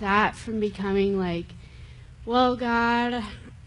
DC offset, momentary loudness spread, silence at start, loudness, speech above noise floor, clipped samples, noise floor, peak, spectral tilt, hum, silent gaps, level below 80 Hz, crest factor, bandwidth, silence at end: under 0.1%; 16 LU; 0 s; -25 LUFS; 20 dB; under 0.1%; -45 dBFS; -8 dBFS; -6 dB/octave; none; none; -46 dBFS; 18 dB; 11 kHz; 0.05 s